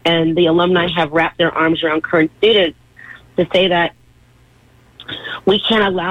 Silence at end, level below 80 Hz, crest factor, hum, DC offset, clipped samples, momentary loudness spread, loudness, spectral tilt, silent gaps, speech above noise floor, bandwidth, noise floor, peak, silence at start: 0 s; -48 dBFS; 14 dB; none; under 0.1%; under 0.1%; 8 LU; -15 LUFS; -6.5 dB/octave; none; 35 dB; 8.8 kHz; -50 dBFS; -2 dBFS; 0.05 s